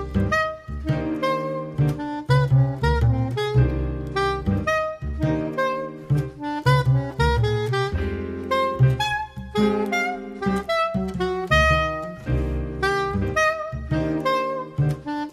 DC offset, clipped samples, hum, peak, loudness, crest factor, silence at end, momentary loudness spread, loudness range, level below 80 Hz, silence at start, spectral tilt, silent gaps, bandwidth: under 0.1%; under 0.1%; none; -6 dBFS; -23 LUFS; 16 dB; 0 s; 8 LU; 2 LU; -32 dBFS; 0 s; -6.5 dB/octave; none; 13.5 kHz